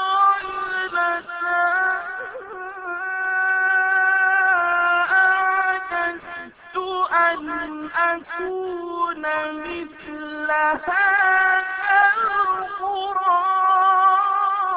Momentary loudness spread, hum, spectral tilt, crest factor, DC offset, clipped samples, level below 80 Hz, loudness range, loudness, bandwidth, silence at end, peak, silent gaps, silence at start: 14 LU; none; -6.5 dB/octave; 16 dB; under 0.1%; under 0.1%; -60 dBFS; 6 LU; -19 LUFS; 4.9 kHz; 0 s; -4 dBFS; none; 0 s